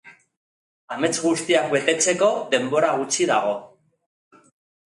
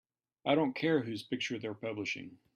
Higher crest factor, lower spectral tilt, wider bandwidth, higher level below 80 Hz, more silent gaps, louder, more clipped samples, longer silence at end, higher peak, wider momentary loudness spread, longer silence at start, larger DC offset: about the same, 20 dB vs 20 dB; second, -2.5 dB/octave vs -5.5 dB/octave; about the same, 11.5 kHz vs 12.5 kHz; first, -72 dBFS vs -78 dBFS; first, 0.37-0.88 s vs none; first, -21 LUFS vs -34 LUFS; neither; first, 1.3 s vs 0.2 s; first, -2 dBFS vs -16 dBFS; about the same, 7 LU vs 9 LU; second, 0.05 s vs 0.45 s; neither